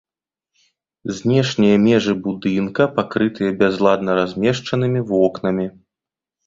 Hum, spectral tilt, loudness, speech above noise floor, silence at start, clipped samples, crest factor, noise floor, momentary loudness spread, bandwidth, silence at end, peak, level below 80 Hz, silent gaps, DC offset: none; -6.5 dB/octave; -18 LUFS; 70 dB; 1.05 s; under 0.1%; 16 dB; -88 dBFS; 7 LU; 7.6 kHz; 0.75 s; -2 dBFS; -54 dBFS; none; under 0.1%